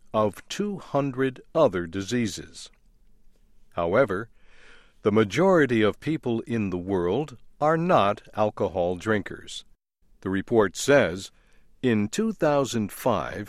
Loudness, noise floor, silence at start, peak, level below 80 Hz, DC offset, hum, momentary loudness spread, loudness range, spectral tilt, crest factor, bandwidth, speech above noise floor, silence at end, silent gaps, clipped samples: -25 LUFS; -59 dBFS; 0.15 s; -6 dBFS; -54 dBFS; under 0.1%; none; 16 LU; 4 LU; -5.5 dB/octave; 20 dB; 15 kHz; 35 dB; 0 s; none; under 0.1%